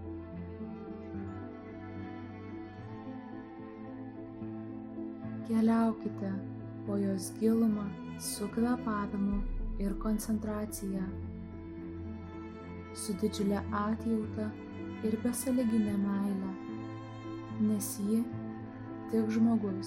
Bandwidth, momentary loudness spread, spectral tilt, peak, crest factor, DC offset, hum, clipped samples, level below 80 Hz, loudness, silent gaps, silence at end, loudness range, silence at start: 15.5 kHz; 15 LU; -6 dB/octave; -16 dBFS; 18 dB; under 0.1%; none; under 0.1%; -50 dBFS; -35 LUFS; none; 0 s; 11 LU; 0 s